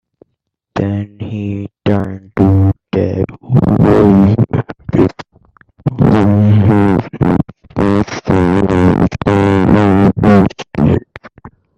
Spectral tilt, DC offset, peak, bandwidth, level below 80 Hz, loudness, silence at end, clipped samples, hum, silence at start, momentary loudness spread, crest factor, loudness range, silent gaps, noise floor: -9 dB/octave; under 0.1%; 0 dBFS; 8.2 kHz; -34 dBFS; -12 LUFS; 0.3 s; under 0.1%; none; 0.75 s; 11 LU; 12 dB; 3 LU; none; -71 dBFS